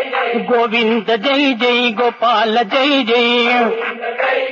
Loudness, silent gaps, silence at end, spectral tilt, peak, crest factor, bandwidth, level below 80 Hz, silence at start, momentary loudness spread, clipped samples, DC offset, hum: -14 LUFS; none; 0 s; -4.5 dB/octave; -4 dBFS; 12 dB; 7.2 kHz; -74 dBFS; 0 s; 5 LU; under 0.1%; under 0.1%; none